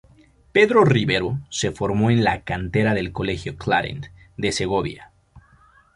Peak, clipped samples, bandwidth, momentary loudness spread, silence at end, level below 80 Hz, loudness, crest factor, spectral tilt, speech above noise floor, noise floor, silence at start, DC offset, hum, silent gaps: -2 dBFS; under 0.1%; 11.5 kHz; 12 LU; 0.55 s; -44 dBFS; -21 LUFS; 20 dB; -5.5 dB/octave; 34 dB; -54 dBFS; 0.55 s; under 0.1%; none; none